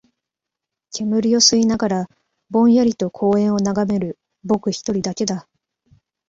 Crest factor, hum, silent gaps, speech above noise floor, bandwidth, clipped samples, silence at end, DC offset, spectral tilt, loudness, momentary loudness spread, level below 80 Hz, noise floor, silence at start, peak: 18 dB; none; none; 67 dB; 7.8 kHz; under 0.1%; 0.9 s; under 0.1%; -4.5 dB/octave; -18 LUFS; 14 LU; -56 dBFS; -84 dBFS; 0.95 s; -2 dBFS